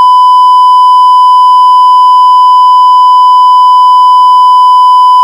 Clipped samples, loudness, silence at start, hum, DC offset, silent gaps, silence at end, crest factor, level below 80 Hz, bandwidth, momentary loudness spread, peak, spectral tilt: 10%; -2 LUFS; 0 s; none; under 0.1%; none; 0 s; 2 dB; under -90 dBFS; 11.5 kHz; 0 LU; 0 dBFS; 6.5 dB/octave